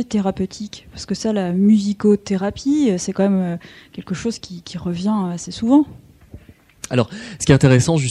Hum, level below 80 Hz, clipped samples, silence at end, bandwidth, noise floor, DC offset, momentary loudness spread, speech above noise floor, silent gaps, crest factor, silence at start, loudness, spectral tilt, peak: none; -46 dBFS; under 0.1%; 0 s; 12 kHz; -43 dBFS; under 0.1%; 17 LU; 25 dB; none; 18 dB; 0 s; -18 LUFS; -6 dB/octave; 0 dBFS